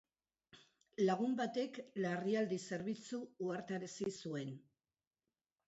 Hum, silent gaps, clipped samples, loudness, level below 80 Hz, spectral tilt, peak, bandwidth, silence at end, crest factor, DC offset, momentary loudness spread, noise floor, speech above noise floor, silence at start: none; none; under 0.1%; -41 LUFS; -84 dBFS; -5.5 dB/octave; -24 dBFS; 8 kHz; 1.05 s; 18 dB; under 0.1%; 9 LU; under -90 dBFS; over 50 dB; 0.55 s